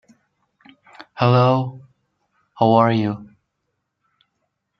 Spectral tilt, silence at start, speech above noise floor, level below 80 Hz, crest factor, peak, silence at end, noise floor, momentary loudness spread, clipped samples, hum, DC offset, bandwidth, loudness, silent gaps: -9 dB/octave; 1 s; 59 dB; -64 dBFS; 20 dB; -2 dBFS; 1.55 s; -75 dBFS; 17 LU; under 0.1%; none; under 0.1%; 6.2 kHz; -18 LUFS; none